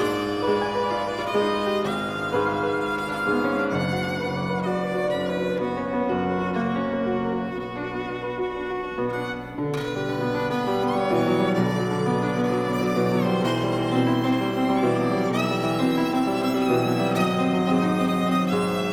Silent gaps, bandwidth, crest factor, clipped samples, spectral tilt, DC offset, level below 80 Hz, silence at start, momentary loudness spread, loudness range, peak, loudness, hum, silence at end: none; 17 kHz; 14 dB; under 0.1%; -6.5 dB/octave; under 0.1%; -52 dBFS; 0 s; 6 LU; 5 LU; -10 dBFS; -24 LUFS; none; 0 s